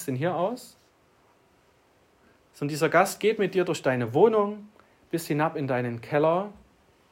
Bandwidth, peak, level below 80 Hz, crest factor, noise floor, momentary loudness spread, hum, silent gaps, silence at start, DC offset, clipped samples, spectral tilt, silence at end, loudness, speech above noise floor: 16 kHz; -8 dBFS; -70 dBFS; 20 dB; -62 dBFS; 12 LU; none; none; 0 s; under 0.1%; under 0.1%; -6 dB/octave; 0.6 s; -26 LUFS; 37 dB